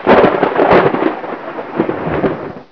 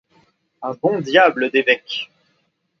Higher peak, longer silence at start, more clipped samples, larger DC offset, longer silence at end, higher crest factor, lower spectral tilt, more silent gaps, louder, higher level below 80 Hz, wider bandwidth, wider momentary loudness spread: about the same, 0 dBFS vs 0 dBFS; second, 0 s vs 0.6 s; neither; first, 0.4% vs under 0.1%; second, 0.1 s vs 0.75 s; second, 14 dB vs 20 dB; first, -8.5 dB/octave vs -5 dB/octave; neither; first, -13 LUFS vs -17 LUFS; first, -40 dBFS vs -72 dBFS; second, 5.4 kHz vs 7 kHz; about the same, 14 LU vs 16 LU